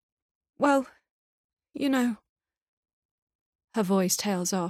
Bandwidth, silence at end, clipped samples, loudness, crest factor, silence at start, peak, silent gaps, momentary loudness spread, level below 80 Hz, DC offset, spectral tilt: 16.5 kHz; 0 s; under 0.1%; -27 LUFS; 20 dB; 0.6 s; -10 dBFS; 1.11-1.57 s, 2.29-2.36 s, 2.62-2.83 s, 2.93-3.27 s, 3.35-3.59 s; 15 LU; -72 dBFS; under 0.1%; -4.5 dB/octave